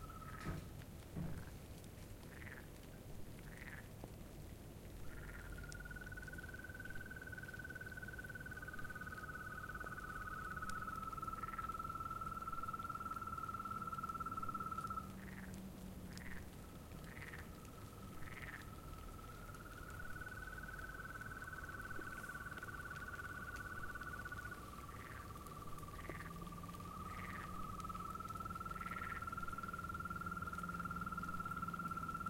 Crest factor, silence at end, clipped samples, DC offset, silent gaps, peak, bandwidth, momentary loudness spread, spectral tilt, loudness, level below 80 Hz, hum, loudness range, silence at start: 18 dB; 0 s; under 0.1%; under 0.1%; none; -30 dBFS; 16.5 kHz; 9 LU; -5 dB/octave; -49 LUFS; -58 dBFS; none; 7 LU; 0 s